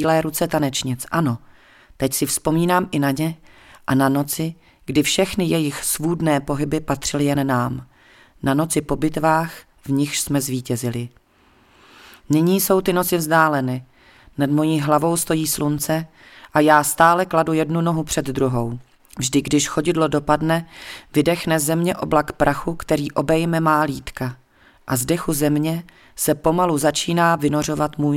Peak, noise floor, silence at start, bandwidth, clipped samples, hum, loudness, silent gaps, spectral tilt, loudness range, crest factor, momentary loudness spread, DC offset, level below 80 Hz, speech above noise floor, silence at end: 0 dBFS; -55 dBFS; 0 s; 17 kHz; under 0.1%; none; -20 LUFS; none; -5 dB/octave; 3 LU; 20 dB; 9 LU; under 0.1%; -46 dBFS; 36 dB; 0 s